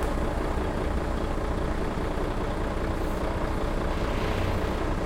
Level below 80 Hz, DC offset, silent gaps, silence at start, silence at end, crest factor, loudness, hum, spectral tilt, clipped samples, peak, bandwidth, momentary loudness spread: -30 dBFS; under 0.1%; none; 0 s; 0 s; 12 dB; -30 LUFS; none; -6.5 dB/octave; under 0.1%; -14 dBFS; 16 kHz; 2 LU